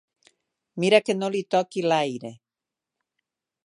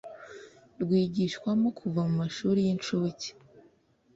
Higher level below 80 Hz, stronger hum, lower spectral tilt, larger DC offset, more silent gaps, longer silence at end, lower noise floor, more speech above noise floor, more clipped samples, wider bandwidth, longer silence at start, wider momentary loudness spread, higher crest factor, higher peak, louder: second, -76 dBFS vs -66 dBFS; neither; second, -5 dB/octave vs -6.5 dB/octave; neither; neither; first, 1.3 s vs 0.55 s; first, -88 dBFS vs -64 dBFS; first, 65 dB vs 36 dB; neither; first, 11 kHz vs 7.8 kHz; first, 0.75 s vs 0.05 s; about the same, 18 LU vs 18 LU; first, 24 dB vs 14 dB; first, -2 dBFS vs -16 dBFS; first, -23 LUFS vs -29 LUFS